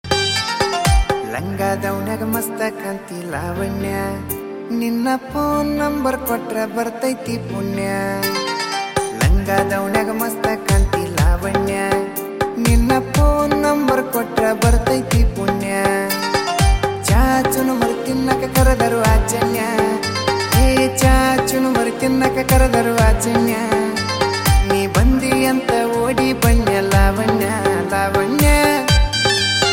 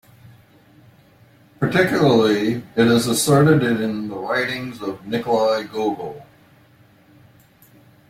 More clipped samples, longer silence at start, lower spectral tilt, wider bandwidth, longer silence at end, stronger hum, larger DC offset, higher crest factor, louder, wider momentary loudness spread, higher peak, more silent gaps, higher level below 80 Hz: neither; second, 0.05 s vs 1.6 s; about the same, -5 dB/octave vs -5.5 dB/octave; about the same, 17 kHz vs 16.5 kHz; second, 0 s vs 1.85 s; neither; neither; about the same, 14 dB vs 18 dB; about the same, -17 LUFS vs -19 LUFS; second, 8 LU vs 12 LU; about the same, -2 dBFS vs -2 dBFS; neither; first, -22 dBFS vs -56 dBFS